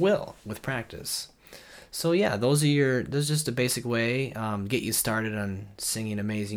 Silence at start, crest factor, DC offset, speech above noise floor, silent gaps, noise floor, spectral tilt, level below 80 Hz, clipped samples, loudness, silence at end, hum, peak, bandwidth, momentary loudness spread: 0 s; 16 dB; under 0.1%; 22 dB; none; -49 dBFS; -4.5 dB/octave; -58 dBFS; under 0.1%; -27 LUFS; 0 s; none; -12 dBFS; 19.5 kHz; 11 LU